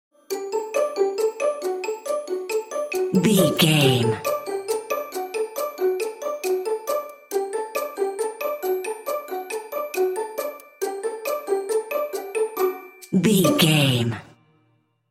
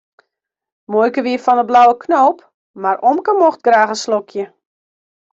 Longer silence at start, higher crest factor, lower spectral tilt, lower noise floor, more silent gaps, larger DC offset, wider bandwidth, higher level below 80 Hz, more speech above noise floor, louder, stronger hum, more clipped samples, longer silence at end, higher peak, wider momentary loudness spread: second, 0.3 s vs 0.9 s; first, 20 dB vs 14 dB; about the same, -5 dB/octave vs -4 dB/octave; second, -65 dBFS vs -77 dBFS; second, none vs 2.54-2.74 s; neither; first, 16.5 kHz vs 8 kHz; about the same, -64 dBFS vs -66 dBFS; second, 47 dB vs 64 dB; second, -24 LUFS vs -14 LUFS; neither; neither; about the same, 0.85 s vs 0.9 s; about the same, -4 dBFS vs -2 dBFS; about the same, 12 LU vs 13 LU